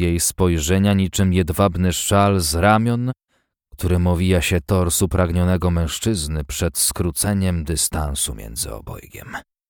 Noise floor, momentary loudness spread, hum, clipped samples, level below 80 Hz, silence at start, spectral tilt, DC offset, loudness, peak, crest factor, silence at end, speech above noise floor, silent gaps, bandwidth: -52 dBFS; 11 LU; none; under 0.1%; -32 dBFS; 0 s; -5 dB/octave; under 0.1%; -19 LUFS; -4 dBFS; 16 dB; 0.3 s; 34 dB; none; 19 kHz